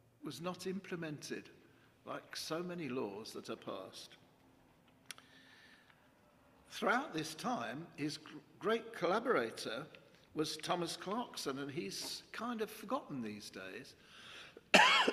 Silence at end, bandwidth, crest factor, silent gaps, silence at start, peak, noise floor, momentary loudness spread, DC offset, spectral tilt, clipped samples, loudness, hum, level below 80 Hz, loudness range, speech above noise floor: 0 s; 15.5 kHz; 28 dB; none; 0.2 s; -12 dBFS; -68 dBFS; 17 LU; under 0.1%; -3 dB/octave; under 0.1%; -38 LUFS; none; -80 dBFS; 9 LU; 26 dB